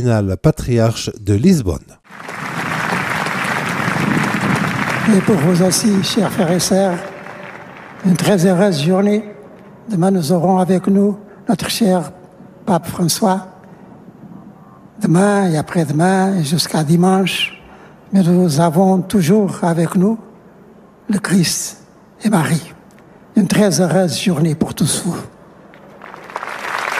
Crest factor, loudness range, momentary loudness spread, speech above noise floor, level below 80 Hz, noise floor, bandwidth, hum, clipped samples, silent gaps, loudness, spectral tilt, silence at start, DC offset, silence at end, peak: 14 dB; 4 LU; 13 LU; 29 dB; -44 dBFS; -43 dBFS; 15.5 kHz; none; under 0.1%; none; -15 LUFS; -5.5 dB/octave; 0 s; under 0.1%; 0 s; -2 dBFS